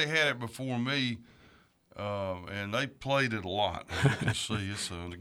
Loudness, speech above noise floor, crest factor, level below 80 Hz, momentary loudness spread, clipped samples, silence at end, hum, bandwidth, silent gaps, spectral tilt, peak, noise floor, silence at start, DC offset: -32 LUFS; 30 dB; 22 dB; -58 dBFS; 9 LU; under 0.1%; 0 s; none; 14.5 kHz; none; -4.5 dB/octave; -10 dBFS; -62 dBFS; 0 s; under 0.1%